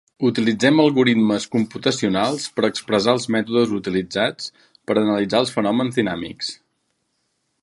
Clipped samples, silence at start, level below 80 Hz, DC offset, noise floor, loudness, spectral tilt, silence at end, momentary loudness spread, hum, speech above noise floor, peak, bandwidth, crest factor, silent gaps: under 0.1%; 0.2 s; -58 dBFS; under 0.1%; -71 dBFS; -20 LUFS; -5 dB/octave; 1.1 s; 10 LU; none; 52 dB; -2 dBFS; 11.5 kHz; 18 dB; none